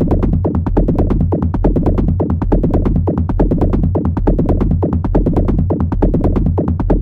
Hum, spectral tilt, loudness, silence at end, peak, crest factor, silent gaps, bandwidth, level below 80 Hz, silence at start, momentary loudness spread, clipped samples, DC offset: none; -11.5 dB/octave; -15 LUFS; 0 s; -2 dBFS; 12 dB; none; 3.7 kHz; -18 dBFS; 0 s; 1 LU; under 0.1%; under 0.1%